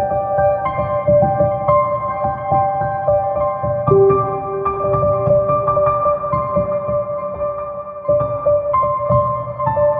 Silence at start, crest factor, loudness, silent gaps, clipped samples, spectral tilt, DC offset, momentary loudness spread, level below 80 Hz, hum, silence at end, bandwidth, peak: 0 s; 16 dB; -17 LUFS; none; under 0.1%; -12 dB/octave; under 0.1%; 6 LU; -40 dBFS; none; 0 s; 3.4 kHz; -2 dBFS